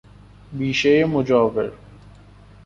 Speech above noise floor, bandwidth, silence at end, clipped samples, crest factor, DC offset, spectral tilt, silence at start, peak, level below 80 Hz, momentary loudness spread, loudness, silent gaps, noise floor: 28 dB; 7.6 kHz; 0.9 s; under 0.1%; 18 dB; under 0.1%; -6 dB/octave; 0.5 s; -4 dBFS; -50 dBFS; 12 LU; -19 LUFS; none; -46 dBFS